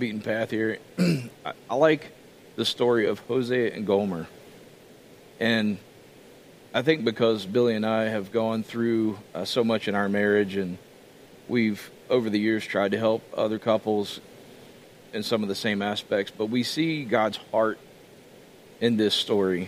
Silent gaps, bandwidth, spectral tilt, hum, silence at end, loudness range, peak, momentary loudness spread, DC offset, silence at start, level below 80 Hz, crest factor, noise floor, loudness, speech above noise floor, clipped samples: none; 15.5 kHz; -5.5 dB/octave; none; 0 s; 3 LU; -6 dBFS; 10 LU; under 0.1%; 0 s; -70 dBFS; 20 dB; -50 dBFS; -26 LUFS; 25 dB; under 0.1%